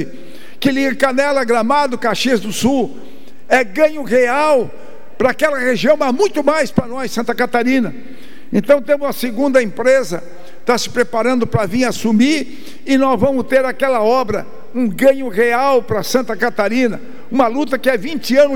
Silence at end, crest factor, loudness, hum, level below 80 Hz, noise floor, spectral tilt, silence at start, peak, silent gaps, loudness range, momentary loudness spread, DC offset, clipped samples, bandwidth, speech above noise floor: 0 s; 14 dB; -15 LUFS; none; -50 dBFS; -38 dBFS; -5 dB/octave; 0 s; 0 dBFS; none; 2 LU; 7 LU; 6%; under 0.1%; 18 kHz; 23 dB